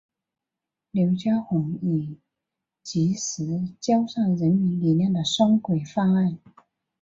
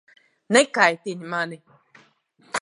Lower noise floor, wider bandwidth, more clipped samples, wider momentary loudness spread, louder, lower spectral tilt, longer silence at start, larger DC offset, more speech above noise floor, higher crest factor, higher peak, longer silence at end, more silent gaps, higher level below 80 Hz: first, -87 dBFS vs -59 dBFS; second, 7.8 kHz vs 11.5 kHz; neither; second, 8 LU vs 13 LU; second, -24 LUFS vs -21 LUFS; first, -6.5 dB/octave vs -3 dB/octave; first, 0.95 s vs 0.5 s; neither; first, 64 dB vs 37 dB; second, 16 dB vs 22 dB; second, -8 dBFS vs -2 dBFS; first, 0.65 s vs 0.05 s; neither; first, -64 dBFS vs -78 dBFS